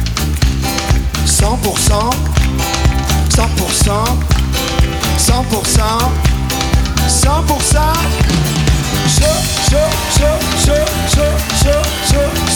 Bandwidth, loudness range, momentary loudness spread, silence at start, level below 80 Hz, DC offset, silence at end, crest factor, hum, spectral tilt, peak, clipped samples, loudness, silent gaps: over 20 kHz; 1 LU; 3 LU; 0 s; -16 dBFS; under 0.1%; 0 s; 12 dB; none; -4 dB/octave; 0 dBFS; under 0.1%; -13 LUFS; none